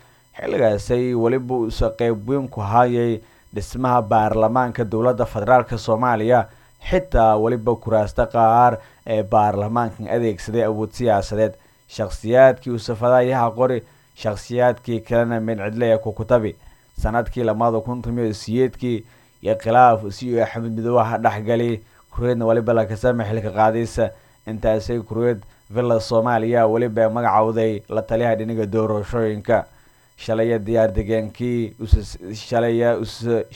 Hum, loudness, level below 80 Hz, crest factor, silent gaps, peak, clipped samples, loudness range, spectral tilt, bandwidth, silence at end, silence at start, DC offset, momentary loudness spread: none; -20 LUFS; -36 dBFS; 20 dB; none; 0 dBFS; under 0.1%; 3 LU; -7.5 dB/octave; 17 kHz; 0 s; 0.35 s; under 0.1%; 9 LU